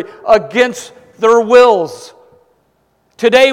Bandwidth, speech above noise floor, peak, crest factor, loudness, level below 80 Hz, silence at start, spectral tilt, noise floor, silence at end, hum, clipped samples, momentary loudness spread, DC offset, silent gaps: 13.5 kHz; 48 dB; 0 dBFS; 12 dB; -11 LUFS; -52 dBFS; 0 s; -3.5 dB/octave; -58 dBFS; 0 s; none; 0.6%; 15 LU; under 0.1%; none